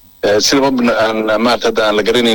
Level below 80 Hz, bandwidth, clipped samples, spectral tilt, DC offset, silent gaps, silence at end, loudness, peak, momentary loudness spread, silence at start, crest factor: -42 dBFS; 18.5 kHz; under 0.1%; -3 dB/octave; under 0.1%; none; 0 s; -12 LUFS; -4 dBFS; 3 LU; 0.25 s; 8 dB